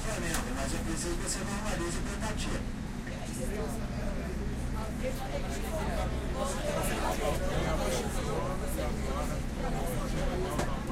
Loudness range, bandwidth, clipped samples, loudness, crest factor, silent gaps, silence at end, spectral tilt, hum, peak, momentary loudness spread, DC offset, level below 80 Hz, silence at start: 3 LU; 16 kHz; under 0.1%; -34 LUFS; 16 dB; none; 0 s; -5 dB/octave; none; -16 dBFS; 5 LU; under 0.1%; -36 dBFS; 0 s